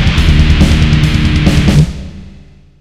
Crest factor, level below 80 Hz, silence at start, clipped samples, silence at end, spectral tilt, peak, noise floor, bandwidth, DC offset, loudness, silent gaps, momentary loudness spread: 10 dB; -14 dBFS; 0 s; 1%; 0.5 s; -6 dB/octave; 0 dBFS; -37 dBFS; 13 kHz; under 0.1%; -10 LUFS; none; 7 LU